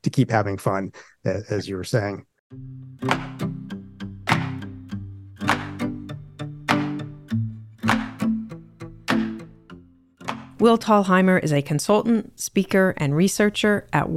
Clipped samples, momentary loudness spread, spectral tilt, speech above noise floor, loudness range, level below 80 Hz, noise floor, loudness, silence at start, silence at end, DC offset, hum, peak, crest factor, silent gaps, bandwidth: under 0.1%; 18 LU; -5.5 dB/octave; 27 dB; 9 LU; -52 dBFS; -48 dBFS; -23 LUFS; 0.05 s; 0 s; under 0.1%; none; -2 dBFS; 20 dB; 2.39-2.50 s; 15.5 kHz